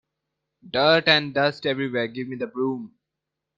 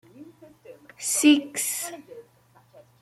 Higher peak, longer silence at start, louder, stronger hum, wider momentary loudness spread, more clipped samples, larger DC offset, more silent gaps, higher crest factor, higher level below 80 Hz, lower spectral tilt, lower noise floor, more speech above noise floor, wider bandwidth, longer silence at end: first, -2 dBFS vs -6 dBFS; first, 0.65 s vs 0.2 s; about the same, -22 LUFS vs -23 LUFS; neither; second, 13 LU vs 16 LU; neither; neither; neither; about the same, 22 dB vs 22 dB; first, -66 dBFS vs -76 dBFS; first, -6 dB/octave vs -1 dB/octave; first, -84 dBFS vs -59 dBFS; first, 61 dB vs 36 dB; second, 7.6 kHz vs 16 kHz; about the same, 0.7 s vs 0.8 s